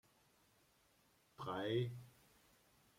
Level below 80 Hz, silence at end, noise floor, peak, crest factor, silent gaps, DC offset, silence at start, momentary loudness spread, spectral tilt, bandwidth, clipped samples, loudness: -80 dBFS; 0.9 s; -75 dBFS; -28 dBFS; 20 dB; none; under 0.1%; 1.4 s; 17 LU; -7 dB/octave; 16.5 kHz; under 0.1%; -43 LUFS